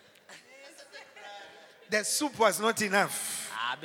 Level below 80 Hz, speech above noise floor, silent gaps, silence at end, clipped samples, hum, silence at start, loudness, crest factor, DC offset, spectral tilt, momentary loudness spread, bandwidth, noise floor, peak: -82 dBFS; 26 dB; none; 0 s; under 0.1%; none; 0.3 s; -28 LUFS; 22 dB; under 0.1%; -2 dB/octave; 24 LU; 18 kHz; -54 dBFS; -10 dBFS